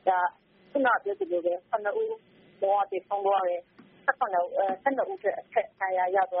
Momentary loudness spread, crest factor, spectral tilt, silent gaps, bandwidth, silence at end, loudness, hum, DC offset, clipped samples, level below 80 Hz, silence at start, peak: 6 LU; 20 dB; -1.5 dB/octave; none; 4 kHz; 0 s; -28 LUFS; none; under 0.1%; under 0.1%; -80 dBFS; 0.05 s; -8 dBFS